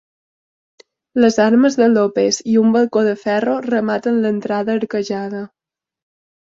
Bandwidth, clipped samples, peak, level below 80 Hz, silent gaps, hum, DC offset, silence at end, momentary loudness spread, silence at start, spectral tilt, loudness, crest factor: 7.8 kHz; under 0.1%; -2 dBFS; -62 dBFS; none; none; under 0.1%; 1.1 s; 10 LU; 1.15 s; -5 dB/octave; -16 LUFS; 16 dB